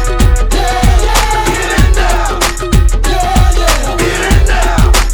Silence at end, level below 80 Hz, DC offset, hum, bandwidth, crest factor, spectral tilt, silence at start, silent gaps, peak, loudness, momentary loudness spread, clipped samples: 0 s; -10 dBFS; 0.5%; none; 19.5 kHz; 8 dB; -4 dB/octave; 0 s; none; 0 dBFS; -11 LUFS; 3 LU; 0.5%